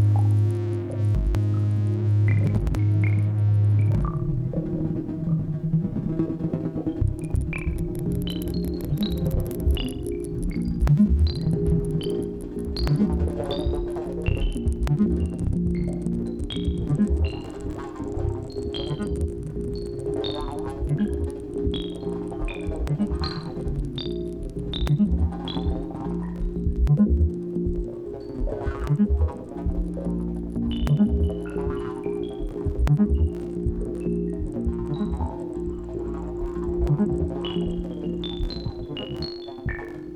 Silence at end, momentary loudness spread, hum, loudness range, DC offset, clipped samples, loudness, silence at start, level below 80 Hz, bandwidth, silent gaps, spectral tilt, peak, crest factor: 0 s; 10 LU; none; 6 LU; under 0.1%; under 0.1%; -26 LUFS; 0 s; -32 dBFS; 13.5 kHz; none; -8.5 dB/octave; -8 dBFS; 16 dB